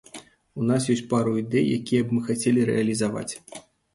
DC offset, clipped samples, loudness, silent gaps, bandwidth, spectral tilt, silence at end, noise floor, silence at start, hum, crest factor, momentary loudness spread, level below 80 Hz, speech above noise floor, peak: under 0.1%; under 0.1%; -24 LUFS; none; 11.5 kHz; -6 dB/octave; 0.35 s; -46 dBFS; 0.15 s; none; 16 dB; 20 LU; -60 dBFS; 23 dB; -8 dBFS